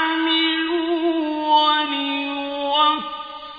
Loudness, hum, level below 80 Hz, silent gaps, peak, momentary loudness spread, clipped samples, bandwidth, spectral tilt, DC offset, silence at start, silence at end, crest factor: -19 LUFS; none; -62 dBFS; none; -6 dBFS; 9 LU; under 0.1%; 5 kHz; -4 dB/octave; under 0.1%; 0 s; 0 s; 14 dB